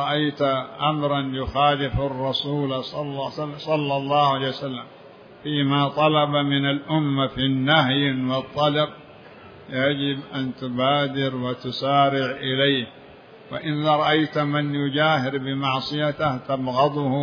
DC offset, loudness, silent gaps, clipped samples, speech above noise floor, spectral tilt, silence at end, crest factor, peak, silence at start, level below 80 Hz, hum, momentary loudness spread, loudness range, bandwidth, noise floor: under 0.1%; -22 LUFS; none; under 0.1%; 23 dB; -7.5 dB/octave; 0 s; 18 dB; -4 dBFS; 0 s; -50 dBFS; none; 9 LU; 4 LU; 5.4 kHz; -45 dBFS